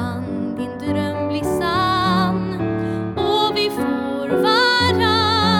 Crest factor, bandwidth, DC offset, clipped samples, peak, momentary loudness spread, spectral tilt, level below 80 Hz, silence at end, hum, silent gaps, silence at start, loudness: 12 dB; 18 kHz; under 0.1%; under 0.1%; -6 dBFS; 10 LU; -5.5 dB/octave; -46 dBFS; 0 s; none; none; 0 s; -19 LUFS